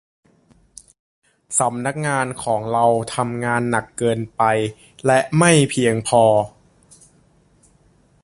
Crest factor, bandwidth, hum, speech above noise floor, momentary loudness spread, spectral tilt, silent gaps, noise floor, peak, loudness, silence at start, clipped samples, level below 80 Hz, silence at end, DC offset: 20 dB; 11.5 kHz; none; 38 dB; 8 LU; -4.5 dB/octave; none; -56 dBFS; 0 dBFS; -19 LUFS; 1.5 s; under 0.1%; -54 dBFS; 1.75 s; under 0.1%